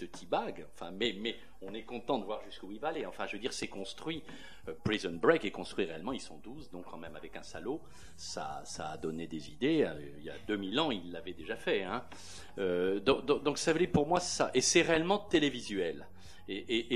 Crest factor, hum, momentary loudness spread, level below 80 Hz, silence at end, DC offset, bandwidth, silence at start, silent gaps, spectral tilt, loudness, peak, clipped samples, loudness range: 24 dB; none; 18 LU; -60 dBFS; 0 s; 0.4%; 14.5 kHz; 0 s; none; -4 dB/octave; -34 LUFS; -12 dBFS; under 0.1%; 10 LU